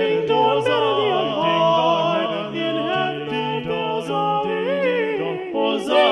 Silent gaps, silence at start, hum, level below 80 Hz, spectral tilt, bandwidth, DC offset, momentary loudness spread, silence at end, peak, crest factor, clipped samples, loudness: none; 0 s; none; -62 dBFS; -5.5 dB/octave; 11.5 kHz; under 0.1%; 7 LU; 0 s; -4 dBFS; 16 dB; under 0.1%; -20 LUFS